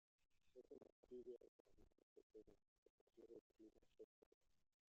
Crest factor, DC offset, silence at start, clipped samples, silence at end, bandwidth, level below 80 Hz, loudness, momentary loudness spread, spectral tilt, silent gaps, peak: 18 dB; under 0.1%; 0.2 s; under 0.1%; 0.3 s; 6.8 kHz; -86 dBFS; -65 LUFS; 9 LU; -7 dB/octave; 0.92-1.03 s, 1.48-1.65 s, 2.03-2.16 s, 2.23-2.30 s, 2.68-3.07 s, 3.41-3.50 s, 4.04-4.41 s; -50 dBFS